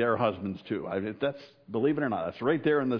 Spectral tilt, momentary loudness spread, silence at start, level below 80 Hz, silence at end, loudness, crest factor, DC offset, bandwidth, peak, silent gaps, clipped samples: -9 dB/octave; 9 LU; 0 s; -68 dBFS; 0 s; -30 LUFS; 16 dB; under 0.1%; 5.4 kHz; -14 dBFS; none; under 0.1%